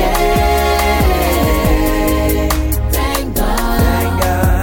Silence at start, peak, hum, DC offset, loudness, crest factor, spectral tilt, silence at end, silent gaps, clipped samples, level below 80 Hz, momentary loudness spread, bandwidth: 0 s; -2 dBFS; none; 0.8%; -14 LUFS; 12 dB; -5 dB/octave; 0 s; none; under 0.1%; -18 dBFS; 3 LU; 17 kHz